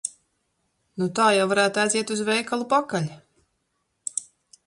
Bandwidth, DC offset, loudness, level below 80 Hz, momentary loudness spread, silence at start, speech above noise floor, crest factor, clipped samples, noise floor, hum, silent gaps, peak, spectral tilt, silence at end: 11.5 kHz; under 0.1%; -23 LUFS; -70 dBFS; 14 LU; 0.05 s; 52 dB; 20 dB; under 0.1%; -74 dBFS; none; none; -6 dBFS; -3.5 dB/octave; 0.45 s